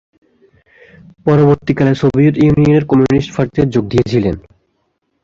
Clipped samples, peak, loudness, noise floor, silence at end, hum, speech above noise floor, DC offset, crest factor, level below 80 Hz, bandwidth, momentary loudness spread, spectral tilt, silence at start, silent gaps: under 0.1%; 0 dBFS; -13 LUFS; -65 dBFS; 0.85 s; none; 54 dB; under 0.1%; 12 dB; -38 dBFS; 7.4 kHz; 6 LU; -8.5 dB/octave; 1.25 s; none